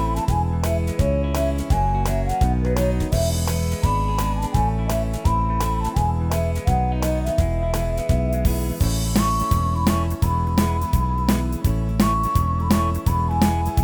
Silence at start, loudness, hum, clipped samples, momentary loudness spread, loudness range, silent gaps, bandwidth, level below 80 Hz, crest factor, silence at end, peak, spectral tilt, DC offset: 0 s; -21 LUFS; none; under 0.1%; 3 LU; 1 LU; none; over 20 kHz; -24 dBFS; 16 dB; 0 s; -4 dBFS; -6.5 dB/octave; 0.1%